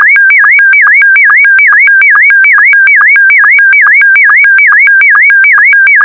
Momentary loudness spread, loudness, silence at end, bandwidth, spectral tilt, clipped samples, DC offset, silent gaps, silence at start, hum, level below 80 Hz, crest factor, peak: 0 LU; -1 LUFS; 0 s; 4.3 kHz; -1 dB/octave; under 0.1%; under 0.1%; none; 0 s; none; -62 dBFS; 4 dB; 0 dBFS